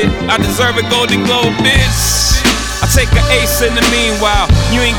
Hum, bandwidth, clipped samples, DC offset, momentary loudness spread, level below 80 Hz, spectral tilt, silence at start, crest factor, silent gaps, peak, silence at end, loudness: none; 20 kHz; under 0.1%; under 0.1%; 3 LU; -18 dBFS; -3.5 dB/octave; 0 s; 10 dB; none; 0 dBFS; 0 s; -11 LUFS